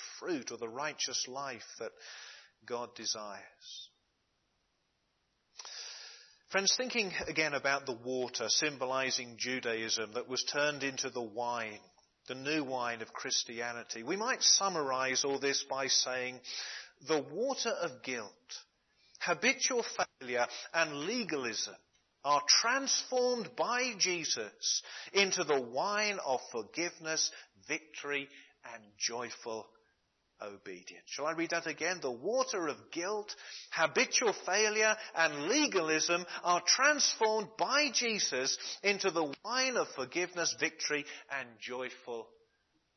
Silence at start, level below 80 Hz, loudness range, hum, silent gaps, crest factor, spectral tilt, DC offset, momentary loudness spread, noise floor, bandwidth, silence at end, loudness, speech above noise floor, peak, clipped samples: 0 s; -82 dBFS; 10 LU; none; none; 24 dB; -1 dB/octave; under 0.1%; 16 LU; -79 dBFS; 6.4 kHz; 0.7 s; -33 LUFS; 44 dB; -12 dBFS; under 0.1%